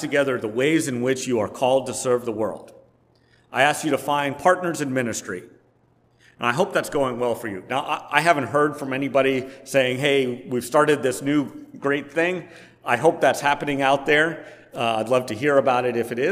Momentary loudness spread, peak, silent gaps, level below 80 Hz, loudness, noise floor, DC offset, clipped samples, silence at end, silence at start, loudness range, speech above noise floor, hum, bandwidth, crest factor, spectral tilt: 9 LU; 0 dBFS; none; -62 dBFS; -22 LUFS; -61 dBFS; under 0.1%; under 0.1%; 0 s; 0 s; 3 LU; 39 dB; none; 16 kHz; 22 dB; -4.5 dB/octave